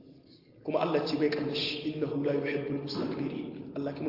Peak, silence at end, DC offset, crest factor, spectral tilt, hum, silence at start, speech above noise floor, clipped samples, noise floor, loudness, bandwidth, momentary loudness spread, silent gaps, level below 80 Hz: -14 dBFS; 0 s; under 0.1%; 18 dB; -7 dB/octave; none; 0 s; 25 dB; under 0.1%; -56 dBFS; -32 LUFS; 5.8 kHz; 8 LU; none; -70 dBFS